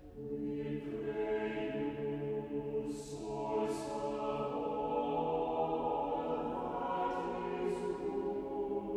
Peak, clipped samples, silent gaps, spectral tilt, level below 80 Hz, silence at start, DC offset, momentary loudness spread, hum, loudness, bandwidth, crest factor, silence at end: -24 dBFS; under 0.1%; none; -6.5 dB/octave; -60 dBFS; 0 s; under 0.1%; 5 LU; none; -38 LUFS; 12 kHz; 14 dB; 0 s